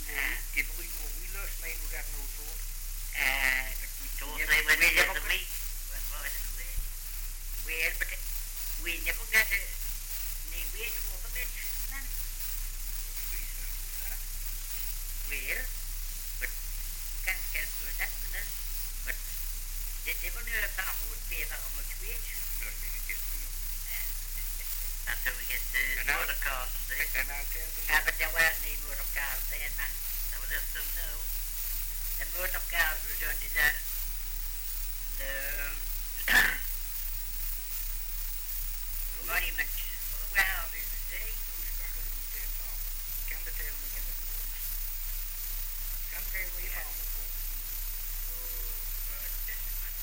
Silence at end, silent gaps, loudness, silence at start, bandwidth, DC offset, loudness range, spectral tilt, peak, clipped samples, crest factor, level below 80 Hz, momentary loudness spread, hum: 0 s; none; -32 LUFS; 0 s; 17 kHz; under 0.1%; 7 LU; -0.5 dB/octave; -12 dBFS; under 0.1%; 22 dB; -38 dBFS; 10 LU; none